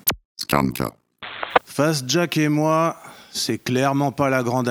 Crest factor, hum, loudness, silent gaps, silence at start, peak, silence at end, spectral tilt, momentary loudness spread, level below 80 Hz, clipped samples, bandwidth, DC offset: 22 dB; none; -21 LUFS; 0.25-0.35 s; 0.05 s; 0 dBFS; 0 s; -4.5 dB/octave; 11 LU; -50 dBFS; under 0.1%; over 20 kHz; under 0.1%